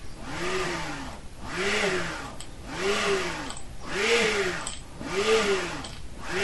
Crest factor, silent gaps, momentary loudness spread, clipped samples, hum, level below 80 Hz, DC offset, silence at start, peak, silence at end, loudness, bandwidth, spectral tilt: 18 dB; none; 16 LU; under 0.1%; none; -44 dBFS; 0.8%; 0 s; -10 dBFS; 0 s; -28 LUFS; 11.5 kHz; -3 dB/octave